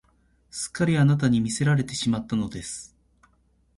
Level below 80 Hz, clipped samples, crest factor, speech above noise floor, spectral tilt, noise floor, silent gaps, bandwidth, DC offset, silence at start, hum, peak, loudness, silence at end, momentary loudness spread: -54 dBFS; under 0.1%; 16 dB; 41 dB; -5.5 dB/octave; -64 dBFS; none; 11.5 kHz; under 0.1%; 0.55 s; none; -10 dBFS; -24 LUFS; 0.9 s; 15 LU